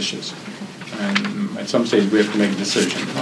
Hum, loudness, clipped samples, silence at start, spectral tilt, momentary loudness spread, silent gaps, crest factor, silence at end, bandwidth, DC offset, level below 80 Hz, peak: none; -20 LUFS; under 0.1%; 0 s; -4 dB/octave; 14 LU; none; 20 dB; 0 s; 11 kHz; under 0.1%; -70 dBFS; -2 dBFS